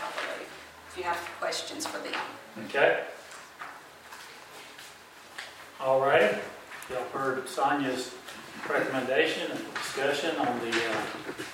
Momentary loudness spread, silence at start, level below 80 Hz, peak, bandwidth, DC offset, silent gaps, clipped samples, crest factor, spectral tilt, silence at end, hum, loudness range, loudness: 20 LU; 0 s; -72 dBFS; -10 dBFS; 16 kHz; under 0.1%; none; under 0.1%; 22 dB; -3 dB/octave; 0 s; none; 4 LU; -29 LUFS